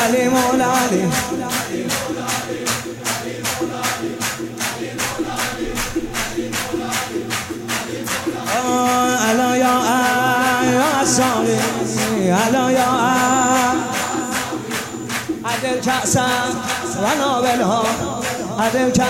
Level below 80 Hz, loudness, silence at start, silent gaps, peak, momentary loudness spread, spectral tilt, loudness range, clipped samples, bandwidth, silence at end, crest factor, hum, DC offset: -46 dBFS; -18 LUFS; 0 s; none; -4 dBFS; 8 LU; -3.5 dB/octave; 6 LU; under 0.1%; 16.5 kHz; 0 s; 16 dB; none; under 0.1%